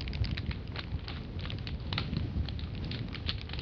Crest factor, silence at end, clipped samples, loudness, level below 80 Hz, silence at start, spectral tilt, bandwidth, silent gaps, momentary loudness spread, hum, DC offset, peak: 20 dB; 0 s; under 0.1%; -37 LUFS; -42 dBFS; 0 s; -7.5 dB/octave; 6.6 kHz; none; 5 LU; none; under 0.1%; -16 dBFS